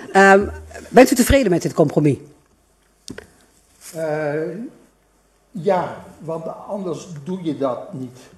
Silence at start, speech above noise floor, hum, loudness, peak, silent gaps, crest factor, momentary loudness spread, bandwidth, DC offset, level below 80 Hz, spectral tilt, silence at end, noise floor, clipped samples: 0 s; 41 dB; none; -18 LUFS; 0 dBFS; none; 20 dB; 23 LU; 14 kHz; under 0.1%; -38 dBFS; -5.5 dB/octave; 0.25 s; -59 dBFS; under 0.1%